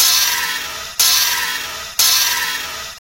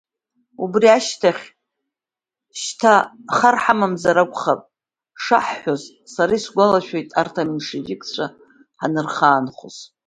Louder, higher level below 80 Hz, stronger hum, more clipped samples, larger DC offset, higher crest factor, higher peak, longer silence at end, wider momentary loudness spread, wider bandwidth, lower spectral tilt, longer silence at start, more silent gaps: first, -14 LUFS vs -19 LUFS; first, -50 dBFS vs -62 dBFS; neither; neither; neither; about the same, 18 dB vs 20 dB; about the same, 0 dBFS vs 0 dBFS; second, 0 s vs 0.25 s; second, 11 LU vs 14 LU; first, 16.5 kHz vs 9.6 kHz; second, 2.5 dB/octave vs -4.5 dB/octave; second, 0 s vs 0.6 s; neither